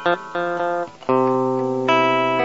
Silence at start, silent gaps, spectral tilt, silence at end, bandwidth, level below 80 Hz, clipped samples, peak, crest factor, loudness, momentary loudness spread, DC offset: 0 s; none; -6 dB/octave; 0 s; 8 kHz; -66 dBFS; under 0.1%; -4 dBFS; 16 dB; -20 LUFS; 7 LU; 0.3%